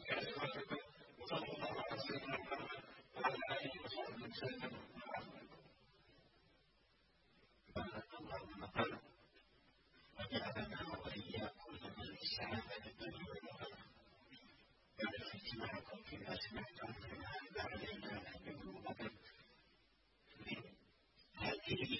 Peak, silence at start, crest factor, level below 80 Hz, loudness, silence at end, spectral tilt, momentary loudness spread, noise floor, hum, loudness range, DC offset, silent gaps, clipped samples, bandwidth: -24 dBFS; 0 s; 24 dB; -70 dBFS; -47 LUFS; 0 s; -2.5 dB/octave; 19 LU; -75 dBFS; none; 8 LU; under 0.1%; none; under 0.1%; 5.8 kHz